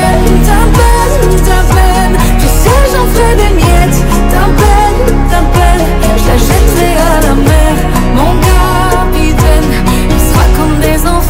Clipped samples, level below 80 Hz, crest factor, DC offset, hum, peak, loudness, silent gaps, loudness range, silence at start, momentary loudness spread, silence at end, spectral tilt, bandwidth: 6%; -8 dBFS; 6 dB; under 0.1%; none; 0 dBFS; -8 LUFS; none; 1 LU; 0 s; 2 LU; 0 s; -5.5 dB/octave; 16.5 kHz